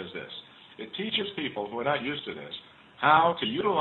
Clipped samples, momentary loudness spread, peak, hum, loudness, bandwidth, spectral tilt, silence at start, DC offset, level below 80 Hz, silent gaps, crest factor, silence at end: under 0.1%; 20 LU; -8 dBFS; none; -27 LUFS; 4.3 kHz; -7.5 dB/octave; 0 s; under 0.1%; -70 dBFS; none; 22 dB; 0 s